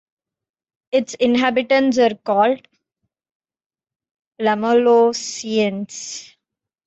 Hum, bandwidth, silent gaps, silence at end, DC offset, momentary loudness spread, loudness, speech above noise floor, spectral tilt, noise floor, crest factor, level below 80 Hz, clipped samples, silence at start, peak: none; 8.2 kHz; 3.31-3.40 s, 3.66-3.70 s, 4.11-4.15 s, 4.27-4.31 s; 0.6 s; under 0.1%; 14 LU; -18 LUFS; 65 dB; -4 dB/octave; -82 dBFS; 14 dB; -66 dBFS; under 0.1%; 0.95 s; -4 dBFS